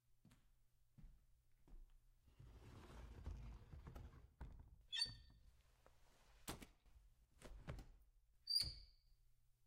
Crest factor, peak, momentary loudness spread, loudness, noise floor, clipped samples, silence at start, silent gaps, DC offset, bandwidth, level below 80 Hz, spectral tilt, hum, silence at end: 26 dB; -28 dBFS; 23 LU; -48 LUFS; -76 dBFS; under 0.1%; 0.1 s; none; under 0.1%; 15.5 kHz; -64 dBFS; -2.5 dB/octave; none; 0 s